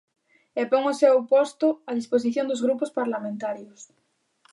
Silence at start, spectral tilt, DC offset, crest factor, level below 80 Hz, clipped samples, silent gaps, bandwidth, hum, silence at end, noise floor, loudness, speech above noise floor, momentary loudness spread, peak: 0.55 s; -5 dB/octave; under 0.1%; 18 dB; -80 dBFS; under 0.1%; none; 11.5 kHz; none; 0.7 s; -64 dBFS; -24 LUFS; 40 dB; 12 LU; -6 dBFS